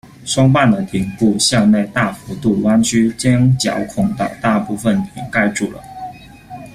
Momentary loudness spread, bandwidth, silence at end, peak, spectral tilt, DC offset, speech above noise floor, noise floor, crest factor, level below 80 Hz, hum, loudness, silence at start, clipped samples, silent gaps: 12 LU; 14.5 kHz; 0.05 s; -2 dBFS; -5 dB/octave; under 0.1%; 20 dB; -35 dBFS; 14 dB; -44 dBFS; none; -15 LUFS; 0.2 s; under 0.1%; none